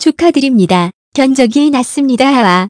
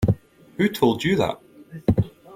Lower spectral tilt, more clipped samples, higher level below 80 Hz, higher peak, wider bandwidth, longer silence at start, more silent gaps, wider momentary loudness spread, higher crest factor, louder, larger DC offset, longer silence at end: second, -5 dB/octave vs -7 dB/octave; first, 0.7% vs under 0.1%; second, -50 dBFS vs -42 dBFS; first, 0 dBFS vs -4 dBFS; second, 11 kHz vs 16.5 kHz; about the same, 0 s vs 0 s; first, 0.94-1.12 s vs none; second, 4 LU vs 20 LU; second, 10 dB vs 18 dB; first, -10 LUFS vs -23 LUFS; neither; about the same, 0 s vs 0 s